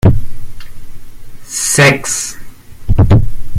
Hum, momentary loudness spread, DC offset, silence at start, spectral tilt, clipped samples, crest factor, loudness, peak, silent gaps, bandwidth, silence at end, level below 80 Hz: none; 15 LU; under 0.1%; 0.05 s; -4.5 dB/octave; under 0.1%; 12 dB; -12 LUFS; 0 dBFS; none; 15.5 kHz; 0 s; -22 dBFS